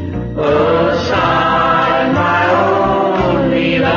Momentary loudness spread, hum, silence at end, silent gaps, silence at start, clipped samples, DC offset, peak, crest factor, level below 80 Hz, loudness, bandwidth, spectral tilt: 2 LU; none; 0 s; none; 0 s; under 0.1%; under 0.1%; -2 dBFS; 12 dB; -34 dBFS; -13 LUFS; 7.2 kHz; -6.5 dB/octave